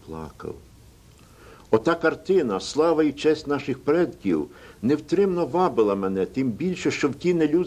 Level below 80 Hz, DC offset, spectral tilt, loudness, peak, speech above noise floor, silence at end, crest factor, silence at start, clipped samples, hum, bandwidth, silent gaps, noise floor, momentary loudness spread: -54 dBFS; under 0.1%; -6 dB/octave; -23 LUFS; -6 dBFS; 28 dB; 0 s; 18 dB; 0.05 s; under 0.1%; none; 14.5 kHz; none; -51 dBFS; 12 LU